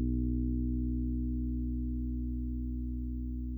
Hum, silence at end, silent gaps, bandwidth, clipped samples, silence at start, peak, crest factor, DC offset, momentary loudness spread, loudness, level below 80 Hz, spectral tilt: 60 Hz at -75 dBFS; 0 s; none; 0.6 kHz; under 0.1%; 0 s; -22 dBFS; 12 dB; under 0.1%; 5 LU; -36 LUFS; -36 dBFS; -14 dB/octave